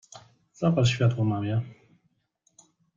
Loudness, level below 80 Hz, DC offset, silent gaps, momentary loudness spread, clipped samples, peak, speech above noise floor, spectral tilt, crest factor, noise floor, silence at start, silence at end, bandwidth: -26 LUFS; -58 dBFS; under 0.1%; none; 8 LU; under 0.1%; -10 dBFS; 48 dB; -6.5 dB/octave; 18 dB; -72 dBFS; 0.15 s; 1.25 s; 7.6 kHz